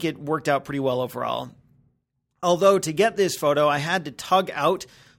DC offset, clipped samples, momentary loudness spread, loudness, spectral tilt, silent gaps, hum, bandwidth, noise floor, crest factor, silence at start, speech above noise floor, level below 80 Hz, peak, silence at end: under 0.1%; under 0.1%; 9 LU; -23 LUFS; -4.5 dB/octave; none; none; 17.5 kHz; -73 dBFS; 18 dB; 0 s; 51 dB; -62 dBFS; -4 dBFS; 0.35 s